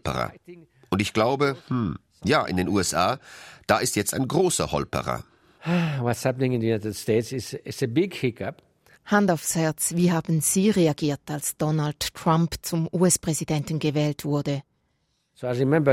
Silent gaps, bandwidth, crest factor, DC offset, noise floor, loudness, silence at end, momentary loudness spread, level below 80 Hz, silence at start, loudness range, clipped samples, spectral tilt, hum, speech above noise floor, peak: none; 16 kHz; 20 dB; under 0.1%; -71 dBFS; -24 LUFS; 0 s; 10 LU; -54 dBFS; 0.05 s; 3 LU; under 0.1%; -5 dB/octave; none; 47 dB; -4 dBFS